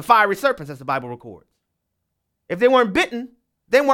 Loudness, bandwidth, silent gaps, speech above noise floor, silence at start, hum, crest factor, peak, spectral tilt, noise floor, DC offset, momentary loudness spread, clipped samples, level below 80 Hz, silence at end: -19 LUFS; 16.5 kHz; none; 57 dB; 0 s; none; 20 dB; -2 dBFS; -4.5 dB/octave; -77 dBFS; under 0.1%; 18 LU; under 0.1%; -58 dBFS; 0 s